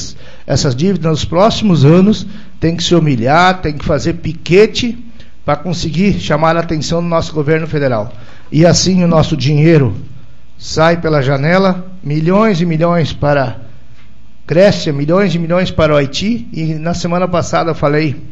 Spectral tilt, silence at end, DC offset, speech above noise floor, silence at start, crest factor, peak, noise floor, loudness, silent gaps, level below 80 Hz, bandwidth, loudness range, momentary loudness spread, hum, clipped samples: -6 dB/octave; 0 s; 6%; 31 dB; 0 s; 12 dB; 0 dBFS; -43 dBFS; -12 LUFS; none; -34 dBFS; 8 kHz; 3 LU; 10 LU; none; 0.2%